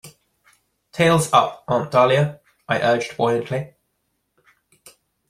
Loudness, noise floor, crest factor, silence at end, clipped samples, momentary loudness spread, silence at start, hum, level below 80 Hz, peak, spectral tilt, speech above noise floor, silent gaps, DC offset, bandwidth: -19 LUFS; -72 dBFS; 20 dB; 1.6 s; under 0.1%; 12 LU; 0.05 s; none; -58 dBFS; -2 dBFS; -5 dB/octave; 54 dB; none; under 0.1%; 15.5 kHz